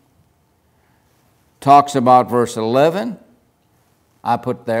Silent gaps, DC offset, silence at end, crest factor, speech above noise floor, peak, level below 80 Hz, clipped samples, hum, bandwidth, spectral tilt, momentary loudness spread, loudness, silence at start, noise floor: none; under 0.1%; 0 s; 18 dB; 45 dB; 0 dBFS; -64 dBFS; under 0.1%; none; 16 kHz; -6 dB/octave; 15 LU; -15 LUFS; 1.6 s; -59 dBFS